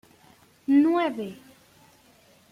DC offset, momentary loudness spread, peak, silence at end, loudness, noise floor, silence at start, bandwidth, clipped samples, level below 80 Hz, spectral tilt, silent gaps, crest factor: under 0.1%; 18 LU; -12 dBFS; 1.2 s; -23 LUFS; -58 dBFS; 0.7 s; 11.5 kHz; under 0.1%; -74 dBFS; -6 dB/octave; none; 16 dB